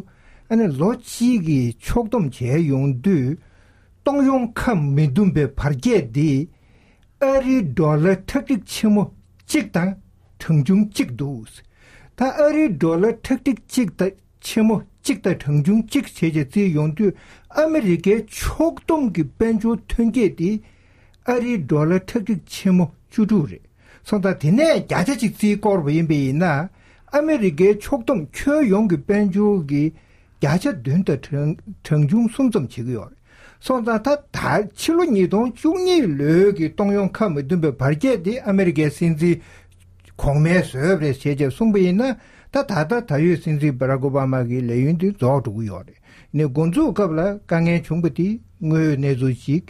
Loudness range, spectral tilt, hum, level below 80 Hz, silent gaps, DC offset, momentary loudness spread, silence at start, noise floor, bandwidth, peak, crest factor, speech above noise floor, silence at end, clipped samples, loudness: 3 LU; -7.5 dB/octave; none; -42 dBFS; none; under 0.1%; 7 LU; 0.5 s; -53 dBFS; 14.5 kHz; -4 dBFS; 14 dB; 35 dB; 0.1 s; under 0.1%; -20 LUFS